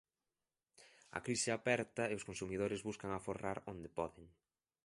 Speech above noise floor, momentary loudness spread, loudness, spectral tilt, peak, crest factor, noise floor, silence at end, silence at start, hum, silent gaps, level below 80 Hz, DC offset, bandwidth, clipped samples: over 49 dB; 10 LU; -41 LUFS; -4 dB/octave; -20 dBFS; 24 dB; under -90 dBFS; 0.6 s; 0.8 s; none; none; -68 dBFS; under 0.1%; 11.5 kHz; under 0.1%